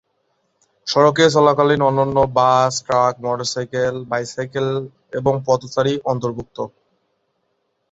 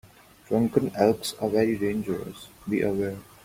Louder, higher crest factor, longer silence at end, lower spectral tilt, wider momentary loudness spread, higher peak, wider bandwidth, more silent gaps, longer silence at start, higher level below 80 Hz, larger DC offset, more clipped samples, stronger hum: first, -18 LUFS vs -26 LUFS; about the same, 18 dB vs 20 dB; first, 1.25 s vs 0.2 s; about the same, -5 dB/octave vs -6 dB/octave; first, 13 LU vs 9 LU; first, -2 dBFS vs -6 dBFS; second, 8 kHz vs 16.5 kHz; neither; first, 0.85 s vs 0.5 s; first, -52 dBFS vs -58 dBFS; neither; neither; neither